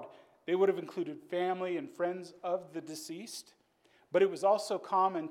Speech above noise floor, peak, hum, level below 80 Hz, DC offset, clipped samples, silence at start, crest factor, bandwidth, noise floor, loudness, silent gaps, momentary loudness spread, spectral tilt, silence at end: 36 dB; -16 dBFS; none; -90 dBFS; under 0.1%; under 0.1%; 0 s; 18 dB; 15.5 kHz; -68 dBFS; -33 LUFS; none; 13 LU; -5 dB/octave; 0 s